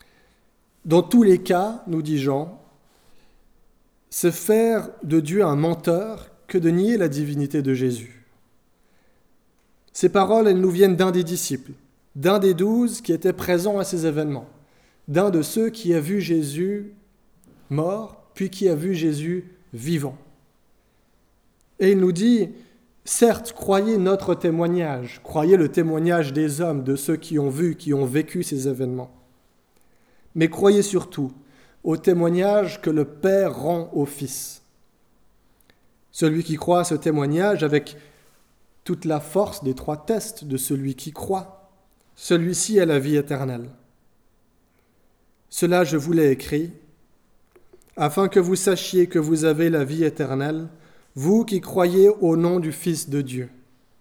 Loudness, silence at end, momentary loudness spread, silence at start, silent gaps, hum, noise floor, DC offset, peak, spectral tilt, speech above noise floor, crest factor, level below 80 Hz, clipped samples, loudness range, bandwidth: -21 LUFS; 0.5 s; 13 LU; 0.85 s; none; none; -62 dBFS; under 0.1%; -2 dBFS; -6 dB/octave; 41 dB; 20 dB; -58 dBFS; under 0.1%; 5 LU; 19 kHz